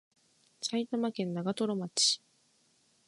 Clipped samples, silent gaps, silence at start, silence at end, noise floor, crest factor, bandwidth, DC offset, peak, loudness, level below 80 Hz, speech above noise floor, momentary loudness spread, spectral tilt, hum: under 0.1%; none; 0.6 s; 0.9 s; -70 dBFS; 22 dB; 11.5 kHz; under 0.1%; -14 dBFS; -32 LUFS; -82 dBFS; 38 dB; 8 LU; -3.5 dB/octave; none